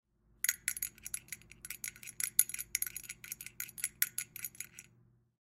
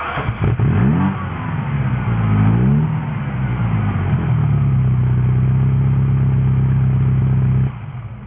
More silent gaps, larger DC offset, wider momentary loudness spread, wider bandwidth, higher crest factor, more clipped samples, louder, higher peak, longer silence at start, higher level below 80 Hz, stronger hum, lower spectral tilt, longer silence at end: neither; neither; first, 17 LU vs 7 LU; first, 16.5 kHz vs 3.6 kHz; first, 34 dB vs 12 dB; neither; second, -37 LUFS vs -17 LUFS; about the same, -6 dBFS vs -4 dBFS; first, 0.45 s vs 0 s; second, -70 dBFS vs -28 dBFS; neither; second, 1.5 dB/octave vs -12.5 dB/octave; first, 0.6 s vs 0 s